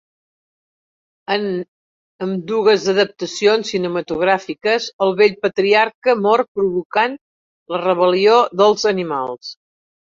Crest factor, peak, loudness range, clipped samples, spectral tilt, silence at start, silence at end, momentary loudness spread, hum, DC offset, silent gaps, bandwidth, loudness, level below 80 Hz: 16 dB; -2 dBFS; 3 LU; under 0.1%; -4.5 dB/octave; 1.3 s; 0.55 s; 12 LU; none; under 0.1%; 1.68-2.19 s, 4.93-4.99 s, 5.94-6.02 s, 6.48-6.55 s, 6.85-6.90 s, 7.21-7.66 s; 7.6 kHz; -17 LUFS; -62 dBFS